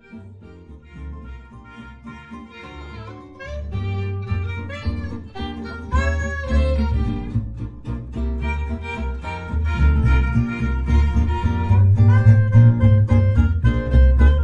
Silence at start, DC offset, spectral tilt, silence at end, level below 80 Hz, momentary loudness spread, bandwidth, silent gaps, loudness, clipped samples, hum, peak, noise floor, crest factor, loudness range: 0.1 s; under 0.1%; -8.5 dB/octave; 0 s; -24 dBFS; 24 LU; 7 kHz; none; -19 LUFS; under 0.1%; none; -2 dBFS; -41 dBFS; 18 dB; 16 LU